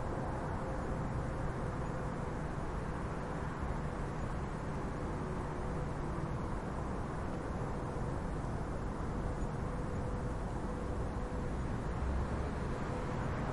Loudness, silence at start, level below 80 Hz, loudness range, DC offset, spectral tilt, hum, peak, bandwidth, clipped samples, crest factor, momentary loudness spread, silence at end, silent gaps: -39 LUFS; 0 s; -42 dBFS; 1 LU; under 0.1%; -7.5 dB/octave; none; -24 dBFS; 11.5 kHz; under 0.1%; 14 dB; 2 LU; 0 s; none